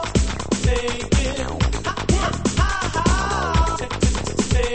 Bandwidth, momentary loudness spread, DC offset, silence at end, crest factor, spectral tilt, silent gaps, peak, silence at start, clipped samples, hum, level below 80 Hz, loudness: 8.8 kHz; 3 LU; under 0.1%; 0 s; 16 dB; -4.5 dB/octave; none; -6 dBFS; 0 s; under 0.1%; none; -24 dBFS; -21 LUFS